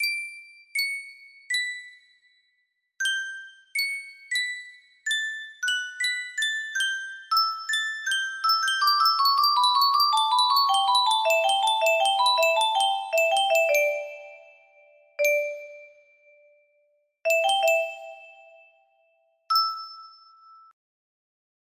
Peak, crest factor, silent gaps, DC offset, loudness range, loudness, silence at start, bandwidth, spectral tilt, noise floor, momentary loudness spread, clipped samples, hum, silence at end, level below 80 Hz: -10 dBFS; 16 dB; none; under 0.1%; 10 LU; -23 LUFS; 0 s; 16 kHz; 3.5 dB/octave; -74 dBFS; 16 LU; under 0.1%; none; 1.6 s; -82 dBFS